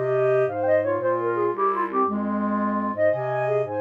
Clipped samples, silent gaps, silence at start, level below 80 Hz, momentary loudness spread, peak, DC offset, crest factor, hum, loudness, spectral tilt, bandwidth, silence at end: under 0.1%; none; 0 s; -66 dBFS; 3 LU; -10 dBFS; under 0.1%; 12 dB; 50 Hz at -60 dBFS; -23 LUFS; -9.5 dB/octave; 5 kHz; 0 s